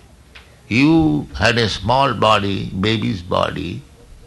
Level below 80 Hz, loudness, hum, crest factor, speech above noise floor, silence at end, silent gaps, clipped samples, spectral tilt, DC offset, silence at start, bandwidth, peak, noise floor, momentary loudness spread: -38 dBFS; -17 LUFS; none; 16 dB; 27 dB; 0.45 s; none; under 0.1%; -6 dB/octave; under 0.1%; 0.35 s; 12 kHz; -2 dBFS; -44 dBFS; 9 LU